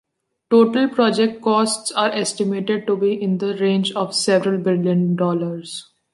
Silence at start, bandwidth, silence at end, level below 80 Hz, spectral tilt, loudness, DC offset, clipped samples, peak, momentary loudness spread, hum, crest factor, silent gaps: 0.5 s; 11.5 kHz; 0.3 s; -68 dBFS; -5 dB/octave; -19 LUFS; under 0.1%; under 0.1%; -4 dBFS; 6 LU; none; 16 dB; none